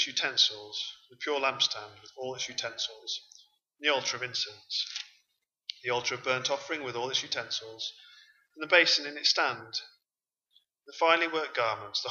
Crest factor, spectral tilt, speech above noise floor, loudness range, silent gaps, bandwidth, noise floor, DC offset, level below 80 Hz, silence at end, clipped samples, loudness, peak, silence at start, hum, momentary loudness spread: 26 dB; -1 dB/octave; over 59 dB; 5 LU; none; 7.6 kHz; under -90 dBFS; under 0.1%; -82 dBFS; 0 s; under 0.1%; -29 LUFS; -6 dBFS; 0 s; none; 14 LU